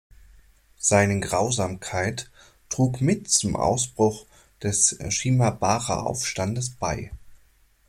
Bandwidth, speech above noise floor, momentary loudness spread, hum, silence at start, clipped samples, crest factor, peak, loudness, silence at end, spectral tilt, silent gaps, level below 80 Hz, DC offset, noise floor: 15.5 kHz; 35 dB; 11 LU; none; 0.8 s; under 0.1%; 20 dB; -6 dBFS; -23 LUFS; 0.55 s; -4 dB/octave; none; -48 dBFS; under 0.1%; -59 dBFS